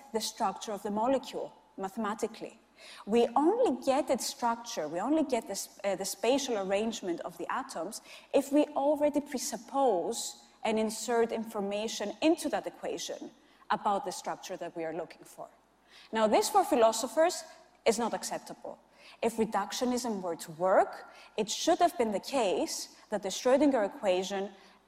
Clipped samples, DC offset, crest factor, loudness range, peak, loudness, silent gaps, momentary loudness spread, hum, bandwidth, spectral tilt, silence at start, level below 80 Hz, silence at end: under 0.1%; under 0.1%; 18 dB; 4 LU; -12 dBFS; -31 LUFS; none; 14 LU; none; 16 kHz; -3.5 dB/octave; 0 s; -70 dBFS; 0.3 s